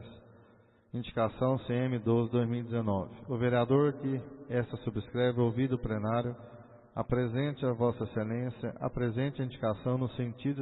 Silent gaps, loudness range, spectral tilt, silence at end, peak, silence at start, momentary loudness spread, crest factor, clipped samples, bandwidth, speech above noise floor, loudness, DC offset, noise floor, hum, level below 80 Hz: none; 3 LU; -11.5 dB/octave; 0 s; -14 dBFS; 0 s; 9 LU; 18 dB; under 0.1%; 4.1 kHz; 31 dB; -32 LUFS; under 0.1%; -62 dBFS; none; -56 dBFS